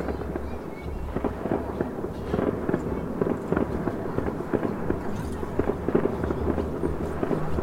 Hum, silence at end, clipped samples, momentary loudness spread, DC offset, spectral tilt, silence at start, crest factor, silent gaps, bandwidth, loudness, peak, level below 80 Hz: none; 0 s; under 0.1%; 7 LU; under 0.1%; -8.5 dB/octave; 0 s; 22 dB; none; 16 kHz; -29 LUFS; -6 dBFS; -38 dBFS